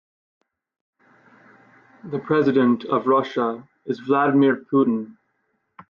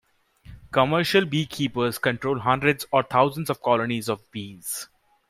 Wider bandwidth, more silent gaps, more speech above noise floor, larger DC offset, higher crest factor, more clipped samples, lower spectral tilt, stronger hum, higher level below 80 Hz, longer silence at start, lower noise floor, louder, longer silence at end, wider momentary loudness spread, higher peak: second, 6.4 kHz vs 16 kHz; neither; first, 52 dB vs 27 dB; neither; about the same, 16 dB vs 20 dB; neither; first, -8.5 dB/octave vs -5 dB/octave; neither; second, -70 dBFS vs -58 dBFS; first, 2.05 s vs 0.5 s; first, -71 dBFS vs -50 dBFS; first, -21 LUFS vs -24 LUFS; first, 0.75 s vs 0.45 s; first, 14 LU vs 11 LU; about the same, -6 dBFS vs -4 dBFS